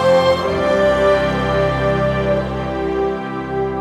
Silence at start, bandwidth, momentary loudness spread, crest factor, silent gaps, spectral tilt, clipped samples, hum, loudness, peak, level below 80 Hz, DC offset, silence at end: 0 s; 12.5 kHz; 8 LU; 14 dB; none; -6.5 dB/octave; under 0.1%; none; -17 LUFS; -2 dBFS; -34 dBFS; under 0.1%; 0 s